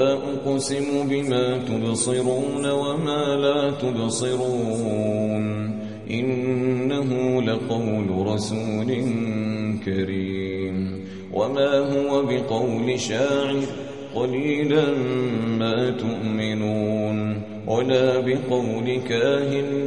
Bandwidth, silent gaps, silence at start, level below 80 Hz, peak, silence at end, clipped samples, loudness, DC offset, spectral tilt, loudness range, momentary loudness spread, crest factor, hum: 11.5 kHz; none; 0 s; -54 dBFS; -6 dBFS; 0 s; under 0.1%; -23 LUFS; 0.3%; -5.5 dB/octave; 2 LU; 6 LU; 16 dB; none